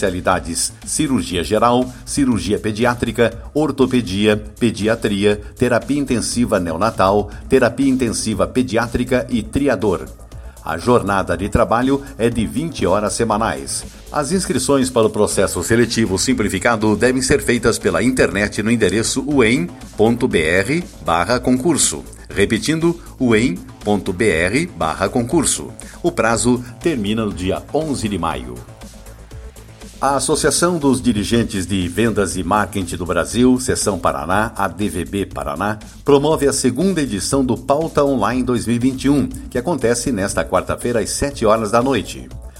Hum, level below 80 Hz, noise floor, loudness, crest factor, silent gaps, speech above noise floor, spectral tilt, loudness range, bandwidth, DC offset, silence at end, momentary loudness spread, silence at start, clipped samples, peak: none; -36 dBFS; -37 dBFS; -17 LUFS; 16 dB; none; 20 dB; -4.5 dB/octave; 3 LU; 16 kHz; under 0.1%; 0 s; 7 LU; 0 s; under 0.1%; 0 dBFS